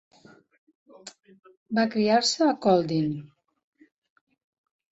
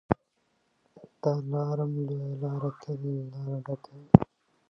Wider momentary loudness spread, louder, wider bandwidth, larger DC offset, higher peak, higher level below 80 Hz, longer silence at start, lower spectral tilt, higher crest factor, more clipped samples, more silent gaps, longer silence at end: first, 25 LU vs 15 LU; first, -24 LUFS vs -29 LUFS; first, 8.2 kHz vs 6.2 kHz; neither; second, -8 dBFS vs 0 dBFS; second, -68 dBFS vs -50 dBFS; first, 1.05 s vs 0.1 s; second, -4.5 dB/octave vs -10.5 dB/octave; second, 20 dB vs 30 dB; neither; first, 1.57-1.66 s vs none; first, 1.7 s vs 0.45 s